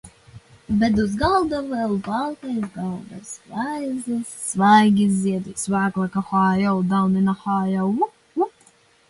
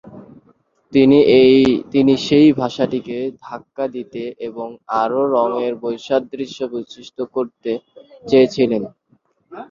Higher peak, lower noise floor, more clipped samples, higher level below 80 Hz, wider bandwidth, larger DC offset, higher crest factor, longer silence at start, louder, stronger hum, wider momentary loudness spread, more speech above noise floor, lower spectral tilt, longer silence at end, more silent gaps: about the same, -4 dBFS vs -2 dBFS; second, -56 dBFS vs -60 dBFS; neither; first, -48 dBFS vs -54 dBFS; first, 11.5 kHz vs 7.4 kHz; neither; about the same, 18 dB vs 16 dB; about the same, 0.05 s vs 0.05 s; second, -21 LUFS vs -17 LUFS; neither; second, 10 LU vs 17 LU; second, 35 dB vs 43 dB; about the same, -6 dB/octave vs -6.5 dB/octave; first, 0.6 s vs 0.05 s; neither